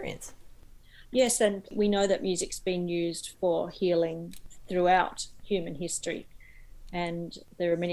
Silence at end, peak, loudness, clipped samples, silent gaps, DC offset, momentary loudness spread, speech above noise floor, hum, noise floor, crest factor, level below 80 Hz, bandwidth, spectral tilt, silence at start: 0 s; -10 dBFS; -29 LUFS; under 0.1%; none; under 0.1%; 15 LU; 22 dB; none; -51 dBFS; 20 dB; -54 dBFS; 15.5 kHz; -4 dB/octave; 0 s